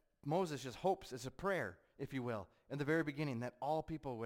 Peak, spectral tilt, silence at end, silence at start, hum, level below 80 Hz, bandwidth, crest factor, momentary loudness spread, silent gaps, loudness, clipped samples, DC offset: -24 dBFS; -6 dB/octave; 0 s; 0.25 s; none; -68 dBFS; 16.5 kHz; 16 dB; 10 LU; none; -42 LUFS; under 0.1%; under 0.1%